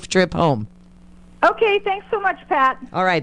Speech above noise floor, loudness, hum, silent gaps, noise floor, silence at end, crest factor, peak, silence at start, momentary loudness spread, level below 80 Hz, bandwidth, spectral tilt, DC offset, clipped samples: 27 dB; -19 LUFS; none; none; -45 dBFS; 0 s; 18 dB; -2 dBFS; 0 s; 6 LU; -48 dBFS; 10.5 kHz; -5 dB/octave; under 0.1%; under 0.1%